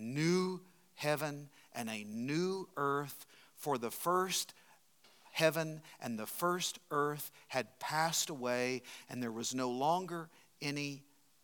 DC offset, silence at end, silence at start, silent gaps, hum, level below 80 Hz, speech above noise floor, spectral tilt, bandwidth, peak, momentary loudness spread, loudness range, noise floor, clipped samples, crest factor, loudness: under 0.1%; 0.4 s; 0 s; none; none; under -90 dBFS; 30 dB; -4 dB/octave; 19 kHz; -14 dBFS; 13 LU; 2 LU; -67 dBFS; under 0.1%; 24 dB; -37 LUFS